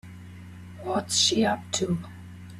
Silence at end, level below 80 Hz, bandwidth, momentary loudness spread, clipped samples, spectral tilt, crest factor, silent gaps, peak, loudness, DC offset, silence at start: 0 s; -60 dBFS; 15 kHz; 23 LU; under 0.1%; -3 dB/octave; 20 dB; none; -10 dBFS; -25 LUFS; under 0.1%; 0.05 s